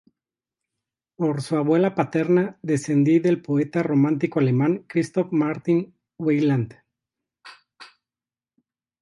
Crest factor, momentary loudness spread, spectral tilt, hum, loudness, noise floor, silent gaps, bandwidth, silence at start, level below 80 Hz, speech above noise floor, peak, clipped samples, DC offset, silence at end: 18 dB; 6 LU; -8 dB/octave; none; -22 LUFS; under -90 dBFS; none; 11.5 kHz; 1.2 s; -68 dBFS; over 69 dB; -6 dBFS; under 0.1%; under 0.1%; 1.15 s